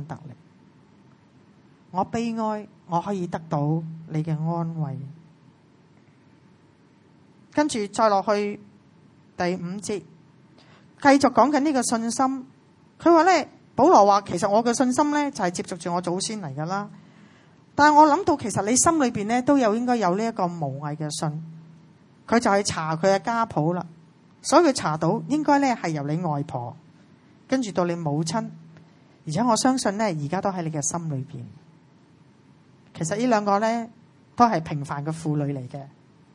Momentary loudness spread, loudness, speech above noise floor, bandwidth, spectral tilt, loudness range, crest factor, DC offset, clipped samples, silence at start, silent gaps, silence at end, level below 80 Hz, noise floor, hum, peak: 14 LU; -23 LUFS; 34 dB; 11.5 kHz; -5 dB/octave; 9 LU; 22 dB; under 0.1%; under 0.1%; 0 s; none; 0.45 s; -64 dBFS; -56 dBFS; none; -2 dBFS